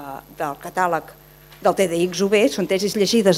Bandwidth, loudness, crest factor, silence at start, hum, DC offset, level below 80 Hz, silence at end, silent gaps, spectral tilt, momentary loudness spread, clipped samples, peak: 16 kHz; -20 LUFS; 18 dB; 0 s; none; under 0.1%; -56 dBFS; 0 s; none; -4.5 dB/octave; 11 LU; under 0.1%; -2 dBFS